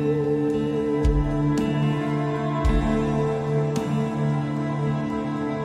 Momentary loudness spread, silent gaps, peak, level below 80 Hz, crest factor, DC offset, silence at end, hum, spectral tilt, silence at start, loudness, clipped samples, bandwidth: 3 LU; none; -10 dBFS; -32 dBFS; 12 dB; under 0.1%; 0 s; none; -8 dB/octave; 0 s; -24 LUFS; under 0.1%; 10.5 kHz